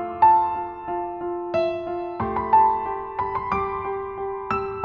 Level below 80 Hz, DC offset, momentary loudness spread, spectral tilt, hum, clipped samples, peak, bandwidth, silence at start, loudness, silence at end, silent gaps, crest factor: -48 dBFS; under 0.1%; 12 LU; -8 dB/octave; none; under 0.1%; -6 dBFS; 5.8 kHz; 0 s; -23 LUFS; 0 s; none; 16 dB